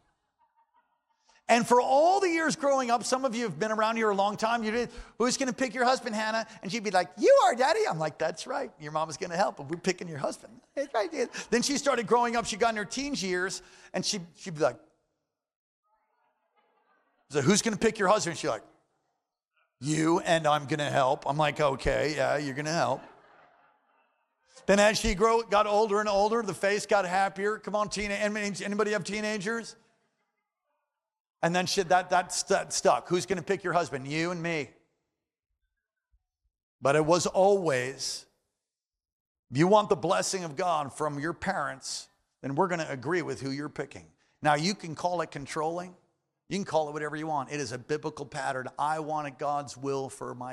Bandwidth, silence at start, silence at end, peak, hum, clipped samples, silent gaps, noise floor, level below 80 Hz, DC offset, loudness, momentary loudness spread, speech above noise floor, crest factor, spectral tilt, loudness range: 14.5 kHz; 1.5 s; 0 s; -10 dBFS; none; under 0.1%; 15.56-15.83 s, 31.20-31.25 s, 36.63-36.79 s, 39.12-39.43 s; under -90 dBFS; -56 dBFS; under 0.1%; -28 LUFS; 11 LU; over 62 dB; 20 dB; -4 dB/octave; 7 LU